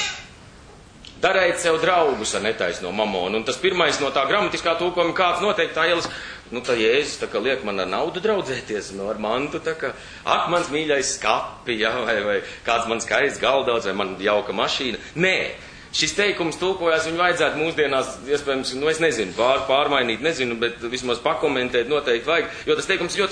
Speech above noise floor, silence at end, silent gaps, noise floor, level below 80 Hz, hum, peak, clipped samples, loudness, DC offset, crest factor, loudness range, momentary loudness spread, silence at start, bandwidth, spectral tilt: 23 dB; 0 s; none; -45 dBFS; -52 dBFS; none; -4 dBFS; under 0.1%; -21 LUFS; under 0.1%; 18 dB; 3 LU; 7 LU; 0 s; 10 kHz; -3 dB/octave